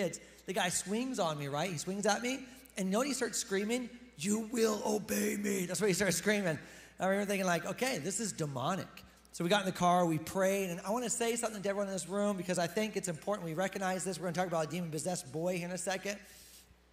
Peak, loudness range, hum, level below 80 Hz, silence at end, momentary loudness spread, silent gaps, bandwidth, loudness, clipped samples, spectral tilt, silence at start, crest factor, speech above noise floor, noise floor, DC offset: -16 dBFS; 3 LU; none; -68 dBFS; 0.3 s; 8 LU; none; 16 kHz; -34 LUFS; under 0.1%; -4 dB/octave; 0 s; 20 dB; 25 dB; -59 dBFS; under 0.1%